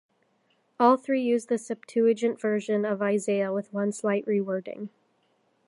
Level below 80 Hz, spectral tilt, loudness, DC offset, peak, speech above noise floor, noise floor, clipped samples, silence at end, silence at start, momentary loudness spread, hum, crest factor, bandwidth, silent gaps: -82 dBFS; -6 dB/octave; -26 LUFS; under 0.1%; -6 dBFS; 44 dB; -69 dBFS; under 0.1%; 0.8 s; 0.8 s; 9 LU; none; 20 dB; 11.5 kHz; none